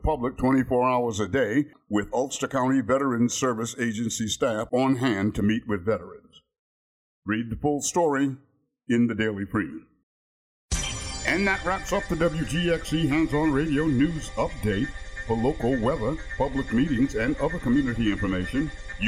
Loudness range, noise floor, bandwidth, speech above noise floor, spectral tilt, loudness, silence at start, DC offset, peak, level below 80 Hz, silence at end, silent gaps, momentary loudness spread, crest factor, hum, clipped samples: 3 LU; under -90 dBFS; 15.5 kHz; over 65 dB; -5 dB/octave; -26 LUFS; 0 s; under 0.1%; -12 dBFS; -40 dBFS; 0 s; 6.59-7.22 s, 10.03-10.69 s; 6 LU; 14 dB; none; under 0.1%